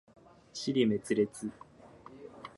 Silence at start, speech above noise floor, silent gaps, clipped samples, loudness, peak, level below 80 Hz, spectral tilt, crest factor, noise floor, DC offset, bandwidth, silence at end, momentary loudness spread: 0.55 s; 24 dB; none; under 0.1%; -32 LUFS; -16 dBFS; -70 dBFS; -5.5 dB/octave; 20 dB; -54 dBFS; under 0.1%; 11.5 kHz; 0.1 s; 22 LU